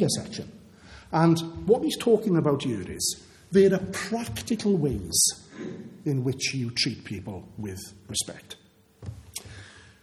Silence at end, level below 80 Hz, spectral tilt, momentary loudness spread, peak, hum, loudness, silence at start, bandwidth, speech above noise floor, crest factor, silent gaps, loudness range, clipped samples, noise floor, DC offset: 0.2 s; -52 dBFS; -4.5 dB/octave; 19 LU; -6 dBFS; none; -26 LUFS; 0 s; 14 kHz; 23 dB; 20 dB; none; 8 LU; under 0.1%; -49 dBFS; under 0.1%